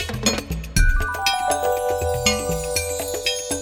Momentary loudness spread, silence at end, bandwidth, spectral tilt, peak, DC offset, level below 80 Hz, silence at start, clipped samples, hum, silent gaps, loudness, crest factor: 3 LU; 0 s; 17 kHz; -3 dB/octave; -4 dBFS; under 0.1%; -26 dBFS; 0 s; under 0.1%; none; none; -22 LUFS; 18 dB